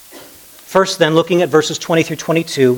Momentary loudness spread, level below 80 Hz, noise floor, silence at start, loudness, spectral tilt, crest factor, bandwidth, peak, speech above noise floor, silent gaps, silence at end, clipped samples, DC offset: 4 LU; -58 dBFS; -39 dBFS; 0.15 s; -15 LUFS; -4.5 dB/octave; 16 dB; 19.5 kHz; 0 dBFS; 26 dB; none; 0 s; under 0.1%; under 0.1%